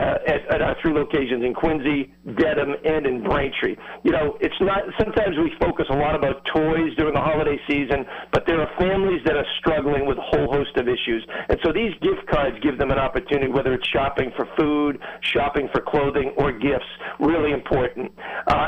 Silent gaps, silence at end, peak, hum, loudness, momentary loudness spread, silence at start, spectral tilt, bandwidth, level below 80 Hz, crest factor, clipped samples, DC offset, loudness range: none; 0 s; -8 dBFS; none; -22 LUFS; 4 LU; 0 s; -7.5 dB/octave; 8.2 kHz; -38 dBFS; 12 dB; under 0.1%; under 0.1%; 1 LU